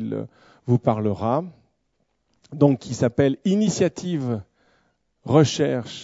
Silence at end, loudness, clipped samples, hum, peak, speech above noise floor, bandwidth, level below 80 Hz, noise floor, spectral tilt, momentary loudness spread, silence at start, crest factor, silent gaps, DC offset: 0 s; -22 LUFS; under 0.1%; none; -2 dBFS; 50 dB; 8 kHz; -58 dBFS; -72 dBFS; -6.5 dB/octave; 16 LU; 0 s; 20 dB; none; under 0.1%